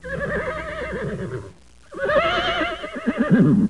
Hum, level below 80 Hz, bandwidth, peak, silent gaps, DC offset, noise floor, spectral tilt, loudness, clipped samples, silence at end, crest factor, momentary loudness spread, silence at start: none; -42 dBFS; 11 kHz; -6 dBFS; none; 0.3%; -44 dBFS; -7 dB/octave; -22 LUFS; under 0.1%; 0 s; 16 dB; 12 LU; 0.05 s